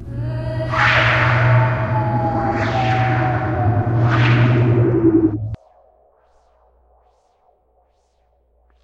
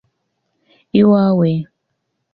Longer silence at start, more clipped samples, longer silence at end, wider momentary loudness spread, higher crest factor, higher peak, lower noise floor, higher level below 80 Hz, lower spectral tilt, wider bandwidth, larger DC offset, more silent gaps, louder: second, 0 s vs 0.95 s; neither; first, 3.3 s vs 0.7 s; about the same, 10 LU vs 12 LU; about the same, 16 dB vs 14 dB; about the same, -2 dBFS vs -2 dBFS; second, -61 dBFS vs -72 dBFS; first, -38 dBFS vs -58 dBFS; second, -8 dB/octave vs -11.5 dB/octave; first, 6.8 kHz vs 5 kHz; neither; neither; second, -17 LUFS vs -14 LUFS